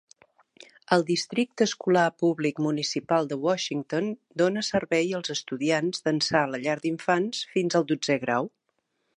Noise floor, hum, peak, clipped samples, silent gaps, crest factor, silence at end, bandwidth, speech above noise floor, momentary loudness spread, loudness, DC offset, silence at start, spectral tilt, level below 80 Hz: -76 dBFS; none; -6 dBFS; under 0.1%; none; 20 dB; 0.7 s; 11 kHz; 50 dB; 5 LU; -26 LUFS; under 0.1%; 0.9 s; -4.5 dB/octave; -68 dBFS